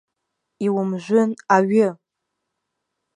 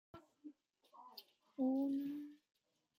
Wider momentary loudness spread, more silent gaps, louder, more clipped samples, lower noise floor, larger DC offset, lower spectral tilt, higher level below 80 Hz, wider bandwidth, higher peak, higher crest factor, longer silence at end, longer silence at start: second, 7 LU vs 23 LU; neither; first, -20 LUFS vs -41 LUFS; neither; first, -79 dBFS vs -67 dBFS; neither; about the same, -7 dB/octave vs -7 dB/octave; first, -76 dBFS vs -90 dBFS; second, 10 kHz vs 16.5 kHz; first, -2 dBFS vs -28 dBFS; about the same, 20 dB vs 16 dB; first, 1.2 s vs 0.65 s; first, 0.6 s vs 0.15 s